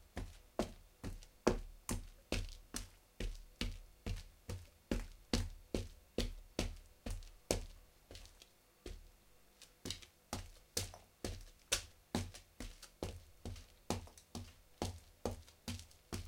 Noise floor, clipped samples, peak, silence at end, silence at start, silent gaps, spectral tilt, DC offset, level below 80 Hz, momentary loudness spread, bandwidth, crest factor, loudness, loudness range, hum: -66 dBFS; under 0.1%; -14 dBFS; 0 s; 0 s; none; -4 dB/octave; under 0.1%; -52 dBFS; 15 LU; 16.5 kHz; 32 dB; -46 LUFS; 4 LU; none